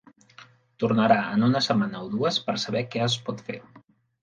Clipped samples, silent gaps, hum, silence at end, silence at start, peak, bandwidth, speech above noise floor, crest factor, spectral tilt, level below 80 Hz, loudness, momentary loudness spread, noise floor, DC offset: under 0.1%; none; none; 0.6 s; 0.4 s; -6 dBFS; 9.4 kHz; 28 dB; 20 dB; -5.5 dB/octave; -64 dBFS; -24 LUFS; 13 LU; -52 dBFS; under 0.1%